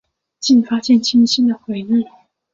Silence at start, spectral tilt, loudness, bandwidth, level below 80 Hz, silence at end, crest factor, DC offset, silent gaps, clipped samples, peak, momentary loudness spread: 0.4 s; -4 dB/octave; -15 LUFS; 7.6 kHz; -62 dBFS; 0.5 s; 12 dB; under 0.1%; none; under 0.1%; -4 dBFS; 11 LU